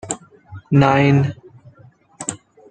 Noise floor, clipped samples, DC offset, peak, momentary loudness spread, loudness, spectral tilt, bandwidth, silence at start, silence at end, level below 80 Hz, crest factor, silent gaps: -49 dBFS; under 0.1%; under 0.1%; -2 dBFS; 16 LU; -18 LUFS; -6 dB/octave; 9.4 kHz; 0.05 s; 0.35 s; -50 dBFS; 18 dB; none